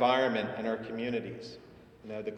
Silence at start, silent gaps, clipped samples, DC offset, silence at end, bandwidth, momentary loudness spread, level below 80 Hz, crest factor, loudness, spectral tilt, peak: 0 s; none; under 0.1%; under 0.1%; 0 s; 9.4 kHz; 20 LU; -68 dBFS; 20 dB; -33 LUFS; -6 dB/octave; -12 dBFS